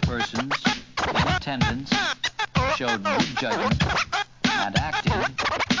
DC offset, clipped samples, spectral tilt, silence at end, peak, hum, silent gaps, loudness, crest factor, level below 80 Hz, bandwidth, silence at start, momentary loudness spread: 0.2%; under 0.1%; -4.5 dB/octave; 0 s; -8 dBFS; none; none; -24 LUFS; 16 dB; -38 dBFS; 7.6 kHz; 0 s; 3 LU